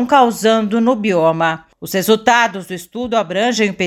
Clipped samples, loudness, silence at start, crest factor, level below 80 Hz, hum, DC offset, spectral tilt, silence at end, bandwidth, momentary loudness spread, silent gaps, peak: under 0.1%; -15 LUFS; 0 s; 14 dB; -54 dBFS; none; under 0.1%; -4.5 dB/octave; 0 s; 17 kHz; 12 LU; none; 0 dBFS